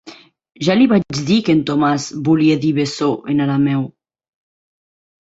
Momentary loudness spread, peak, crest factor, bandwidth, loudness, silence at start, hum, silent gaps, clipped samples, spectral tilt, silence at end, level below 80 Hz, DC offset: 6 LU; -2 dBFS; 14 dB; 8 kHz; -16 LUFS; 0.05 s; none; none; under 0.1%; -6 dB/octave; 1.5 s; -54 dBFS; under 0.1%